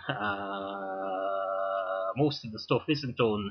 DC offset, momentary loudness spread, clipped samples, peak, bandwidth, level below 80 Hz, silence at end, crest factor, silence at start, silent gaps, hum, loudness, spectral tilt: under 0.1%; 7 LU; under 0.1%; -12 dBFS; 6.6 kHz; -62 dBFS; 0 s; 18 dB; 0 s; none; none; -31 LUFS; -7 dB/octave